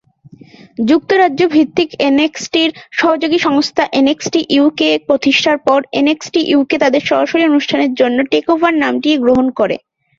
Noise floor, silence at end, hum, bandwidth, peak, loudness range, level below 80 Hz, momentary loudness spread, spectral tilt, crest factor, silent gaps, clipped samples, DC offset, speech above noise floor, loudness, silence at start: -41 dBFS; 0.4 s; none; 7.6 kHz; 0 dBFS; 1 LU; -54 dBFS; 4 LU; -4 dB/octave; 12 dB; none; under 0.1%; under 0.1%; 29 dB; -13 LUFS; 0.8 s